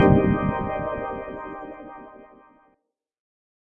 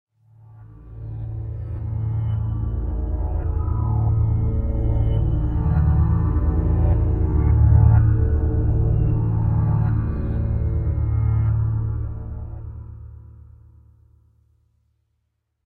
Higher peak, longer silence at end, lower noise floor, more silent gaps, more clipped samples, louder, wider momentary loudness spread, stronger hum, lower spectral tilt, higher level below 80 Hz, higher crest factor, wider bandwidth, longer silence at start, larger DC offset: about the same, -4 dBFS vs -4 dBFS; second, 1.5 s vs 2.35 s; about the same, -72 dBFS vs -73 dBFS; neither; neither; second, -25 LUFS vs -21 LUFS; first, 22 LU vs 15 LU; neither; second, -10.5 dB/octave vs -12.5 dB/octave; second, -42 dBFS vs -24 dBFS; about the same, 22 dB vs 18 dB; first, 3.7 kHz vs 2.9 kHz; second, 0 s vs 0.55 s; neither